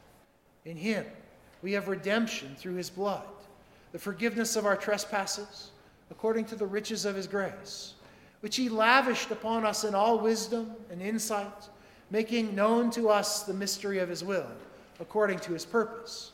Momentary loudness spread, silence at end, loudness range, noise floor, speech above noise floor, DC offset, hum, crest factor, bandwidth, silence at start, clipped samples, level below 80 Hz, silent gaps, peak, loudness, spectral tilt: 16 LU; 0 s; 6 LU; -63 dBFS; 32 dB; under 0.1%; none; 24 dB; 16 kHz; 0.65 s; under 0.1%; -68 dBFS; none; -8 dBFS; -30 LUFS; -3.5 dB/octave